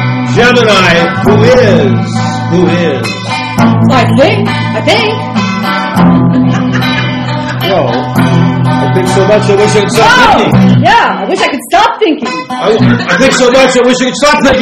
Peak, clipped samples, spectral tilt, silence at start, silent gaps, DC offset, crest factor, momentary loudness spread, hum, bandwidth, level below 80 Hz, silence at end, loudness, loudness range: 0 dBFS; 3%; -5.5 dB/octave; 0 s; none; under 0.1%; 8 dB; 7 LU; none; 14.5 kHz; -34 dBFS; 0 s; -7 LUFS; 3 LU